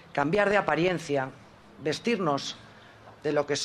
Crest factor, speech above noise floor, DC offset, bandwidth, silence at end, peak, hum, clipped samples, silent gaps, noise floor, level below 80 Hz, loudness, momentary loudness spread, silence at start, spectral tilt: 20 dB; 24 dB; under 0.1%; 12.5 kHz; 0 s; -8 dBFS; none; under 0.1%; none; -51 dBFS; -60 dBFS; -28 LUFS; 12 LU; 0.15 s; -4.5 dB/octave